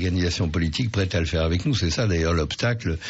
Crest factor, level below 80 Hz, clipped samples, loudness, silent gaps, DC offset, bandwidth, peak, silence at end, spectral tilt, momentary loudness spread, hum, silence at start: 10 dB; -34 dBFS; under 0.1%; -23 LUFS; none; under 0.1%; 8 kHz; -12 dBFS; 0 s; -5 dB/octave; 2 LU; none; 0 s